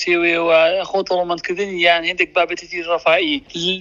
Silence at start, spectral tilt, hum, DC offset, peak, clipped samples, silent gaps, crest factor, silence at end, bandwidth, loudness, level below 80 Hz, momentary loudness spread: 0 s; -3.5 dB/octave; none; under 0.1%; 0 dBFS; under 0.1%; none; 18 dB; 0 s; 7.4 kHz; -17 LUFS; -54 dBFS; 8 LU